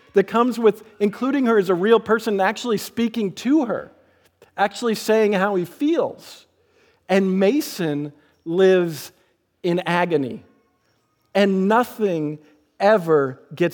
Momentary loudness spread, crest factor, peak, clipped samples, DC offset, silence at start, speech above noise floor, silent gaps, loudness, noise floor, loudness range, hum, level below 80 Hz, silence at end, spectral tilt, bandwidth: 11 LU; 16 dB; -4 dBFS; under 0.1%; under 0.1%; 0.15 s; 46 dB; none; -20 LUFS; -66 dBFS; 3 LU; none; -72 dBFS; 0 s; -6 dB/octave; 19.5 kHz